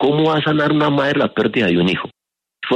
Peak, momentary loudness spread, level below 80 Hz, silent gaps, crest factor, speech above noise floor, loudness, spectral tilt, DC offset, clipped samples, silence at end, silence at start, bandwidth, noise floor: -4 dBFS; 8 LU; -54 dBFS; none; 12 dB; 22 dB; -16 LUFS; -7 dB/octave; under 0.1%; under 0.1%; 0 s; 0 s; 8.6 kHz; -38 dBFS